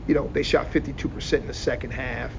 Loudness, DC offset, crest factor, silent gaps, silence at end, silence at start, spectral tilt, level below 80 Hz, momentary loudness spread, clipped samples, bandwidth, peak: -26 LUFS; under 0.1%; 18 dB; none; 0 s; 0 s; -5.5 dB/octave; -36 dBFS; 7 LU; under 0.1%; 7.6 kHz; -8 dBFS